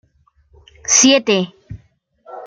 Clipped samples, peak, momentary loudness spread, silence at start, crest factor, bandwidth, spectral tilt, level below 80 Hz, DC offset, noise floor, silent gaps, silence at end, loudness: under 0.1%; 0 dBFS; 18 LU; 0.9 s; 18 dB; 10.5 kHz; -2 dB/octave; -52 dBFS; under 0.1%; -57 dBFS; none; 0 s; -12 LUFS